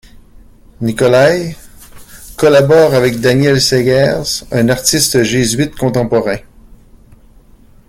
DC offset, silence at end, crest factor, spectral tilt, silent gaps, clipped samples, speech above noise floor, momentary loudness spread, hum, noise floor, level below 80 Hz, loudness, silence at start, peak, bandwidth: under 0.1%; 1.5 s; 12 dB; -4.5 dB/octave; none; under 0.1%; 31 dB; 11 LU; none; -42 dBFS; -38 dBFS; -11 LUFS; 0.8 s; 0 dBFS; 17 kHz